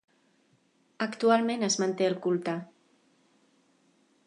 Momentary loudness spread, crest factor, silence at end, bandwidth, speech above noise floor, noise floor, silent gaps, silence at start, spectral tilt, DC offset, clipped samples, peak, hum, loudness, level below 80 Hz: 10 LU; 20 dB; 1.6 s; 11 kHz; 41 dB; -68 dBFS; none; 1 s; -4 dB/octave; under 0.1%; under 0.1%; -10 dBFS; none; -28 LUFS; -84 dBFS